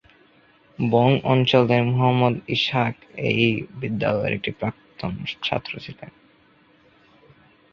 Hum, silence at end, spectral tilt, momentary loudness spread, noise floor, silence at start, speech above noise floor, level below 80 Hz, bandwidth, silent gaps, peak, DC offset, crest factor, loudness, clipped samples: none; 1.65 s; -7.5 dB/octave; 13 LU; -57 dBFS; 0.8 s; 35 dB; -54 dBFS; 6.8 kHz; none; -2 dBFS; under 0.1%; 20 dB; -22 LUFS; under 0.1%